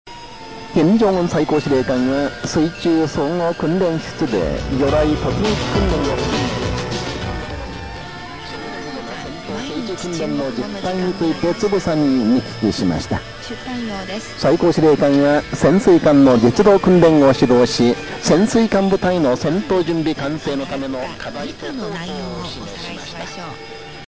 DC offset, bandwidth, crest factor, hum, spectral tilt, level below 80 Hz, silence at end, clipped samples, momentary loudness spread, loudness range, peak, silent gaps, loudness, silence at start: 0.7%; 8 kHz; 18 dB; none; -6 dB/octave; -36 dBFS; 0 s; under 0.1%; 16 LU; 13 LU; 0 dBFS; none; -17 LUFS; 0.05 s